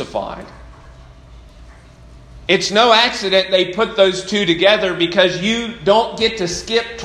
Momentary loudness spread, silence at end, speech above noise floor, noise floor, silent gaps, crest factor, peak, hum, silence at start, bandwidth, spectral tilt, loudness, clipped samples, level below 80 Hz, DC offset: 10 LU; 0 s; 25 dB; -41 dBFS; none; 18 dB; 0 dBFS; none; 0 s; 12 kHz; -3.5 dB/octave; -15 LUFS; under 0.1%; -44 dBFS; under 0.1%